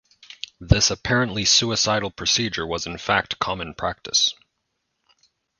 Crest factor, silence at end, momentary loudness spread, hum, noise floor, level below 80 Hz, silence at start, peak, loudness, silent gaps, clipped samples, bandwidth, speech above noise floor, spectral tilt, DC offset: 24 dB; 1.25 s; 11 LU; none; -76 dBFS; -40 dBFS; 0.3 s; 0 dBFS; -21 LUFS; none; under 0.1%; 10.5 kHz; 54 dB; -2.5 dB/octave; under 0.1%